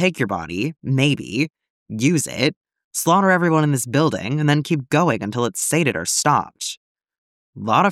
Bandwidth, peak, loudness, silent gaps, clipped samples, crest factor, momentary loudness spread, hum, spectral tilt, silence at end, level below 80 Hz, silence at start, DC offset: 16 kHz; -2 dBFS; -20 LUFS; 1.70-1.86 s, 2.56-2.61 s, 2.84-2.91 s, 6.77-6.95 s, 7.18-7.53 s; under 0.1%; 16 dB; 10 LU; none; -4.5 dB/octave; 0 s; -60 dBFS; 0 s; under 0.1%